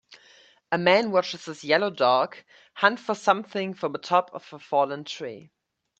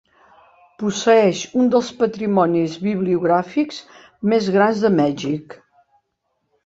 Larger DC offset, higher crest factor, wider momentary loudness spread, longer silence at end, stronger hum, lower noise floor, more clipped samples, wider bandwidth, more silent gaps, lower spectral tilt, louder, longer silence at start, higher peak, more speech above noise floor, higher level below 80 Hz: neither; first, 24 dB vs 16 dB; first, 14 LU vs 10 LU; second, 0.6 s vs 1.1 s; neither; second, -56 dBFS vs -72 dBFS; neither; first, 8.6 kHz vs 7.8 kHz; neither; second, -4.5 dB/octave vs -6 dB/octave; second, -24 LUFS vs -19 LUFS; second, 0.1 s vs 0.8 s; about the same, -2 dBFS vs -2 dBFS; second, 31 dB vs 55 dB; second, -74 dBFS vs -62 dBFS